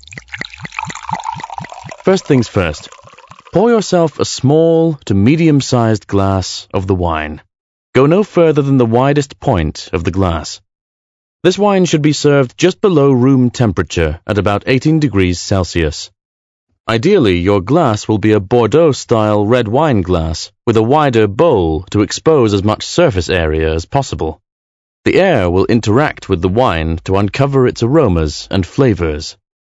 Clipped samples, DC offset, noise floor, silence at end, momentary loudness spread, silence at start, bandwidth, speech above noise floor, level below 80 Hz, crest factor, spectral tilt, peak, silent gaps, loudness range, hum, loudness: 0.3%; under 0.1%; -39 dBFS; 0.3 s; 11 LU; 0.1 s; 8.4 kHz; 27 dB; -32 dBFS; 12 dB; -6 dB/octave; 0 dBFS; 7.60-7.93 s, 10.81-11.40 s, 16.25-16.67 s, 16.80-16.84 s, 24.52-25.03 s; 3 LU; none; -13 LUFS